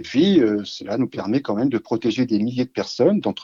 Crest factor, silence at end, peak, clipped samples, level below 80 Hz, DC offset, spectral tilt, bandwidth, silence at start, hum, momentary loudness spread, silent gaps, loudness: 16 dB; 0 s; -4 dBFS; under 0.1%; -62 dBFS; under 0.1%; -6.5 dB/octave; 7.4 kHz; 0 s; none; 8 LU; none; -21 LUFS